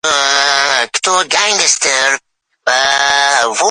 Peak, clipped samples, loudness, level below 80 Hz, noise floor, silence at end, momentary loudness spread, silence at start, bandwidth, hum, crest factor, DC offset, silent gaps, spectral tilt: 0 dBFS; under 0.1%; -11 LUFS; -58 dBFS; -45 dBFS; 0 s; 4 LU; 0.05 s; 16 kHz; none; 12 dB; under 0.1%; none; 1.5 dB/octave